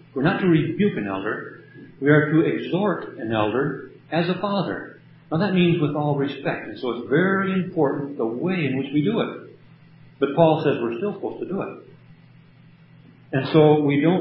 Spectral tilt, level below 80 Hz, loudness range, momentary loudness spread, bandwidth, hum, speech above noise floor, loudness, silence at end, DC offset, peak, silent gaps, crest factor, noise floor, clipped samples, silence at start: -12 dB/octave; -64 dBFS; 3 LU; 11 LU; 5.8 kHz; none; 29 dB; -22 LUFS; 0 s; under 0.1%; -2 dBFS; none; 20 dB; -50 dBFS; under 0.1%; 0.15 s